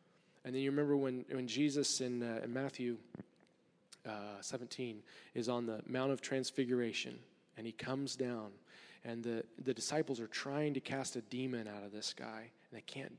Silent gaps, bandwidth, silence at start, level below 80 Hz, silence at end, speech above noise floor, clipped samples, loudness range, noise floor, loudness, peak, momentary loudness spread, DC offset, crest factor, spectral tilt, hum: none; 11 kHz; 0.45 s; -88 dBFS; 0 s; 32 dB; under 0.1%; 6 LU; -72 dBFS; -40 LUFS; -24 dBFS; 17 LU; under 0.1%; 18 dB; -4.5 dB/octave; none